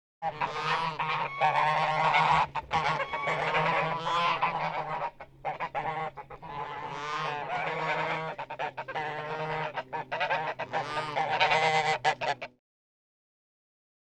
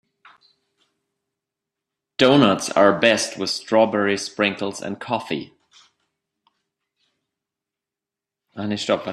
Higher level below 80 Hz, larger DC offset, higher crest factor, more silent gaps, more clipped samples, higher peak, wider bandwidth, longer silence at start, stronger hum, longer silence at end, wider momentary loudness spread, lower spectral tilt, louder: about the same, -60 dBFS vs -64 dBFS; neither; about the same, 20 dB vs 22 dB; neither; neither; second, -10 dBFS vs 0 dBFS; second, 10.5 kHz vs 13 kHz; second, 0.2 s vs 2.2 s; neither; first, 1.65 s vs 0 s; second, 12 LU vs 15 LU; about the same, -4 dB/octave vs -4 dB/octave; second, -30 LUFS vs -20 LUFS